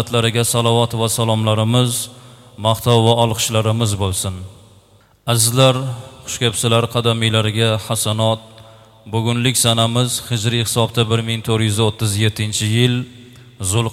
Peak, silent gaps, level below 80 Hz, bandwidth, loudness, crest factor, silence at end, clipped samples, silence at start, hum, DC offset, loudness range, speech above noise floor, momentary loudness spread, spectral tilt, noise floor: 0 dBFS; none; -48 dBFS; 16 kHz; -17 LUFS; 18 dB; 0 s; under 0.1%; 0 s; none; under 0.1%; 2 LU; 34 dB; 9 LU; -4.5 dB/octave; -50 dBFS